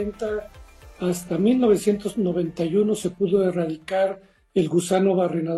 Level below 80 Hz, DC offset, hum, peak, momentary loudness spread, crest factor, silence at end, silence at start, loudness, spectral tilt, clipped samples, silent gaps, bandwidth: -52 dBFS; under 0.1%; none; -8 dBFS; 8 LU; 14 dB; 0 s; 0 s; -23 LUFS; -6.5 dB/octave; under 0.1%; none; 12.5 kHz